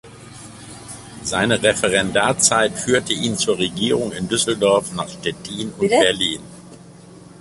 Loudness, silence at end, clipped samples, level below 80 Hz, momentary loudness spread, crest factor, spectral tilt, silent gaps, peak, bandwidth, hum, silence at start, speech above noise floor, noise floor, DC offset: -18 LUFS; 0 s; under 0.1%; -50 dBFS; 20 LU; 20 dB; -3 dB/octave; none; 0 dBFS; 11.5 kHz; none; 0.05 s; 23 dB; -42 dBFS; under 0.1%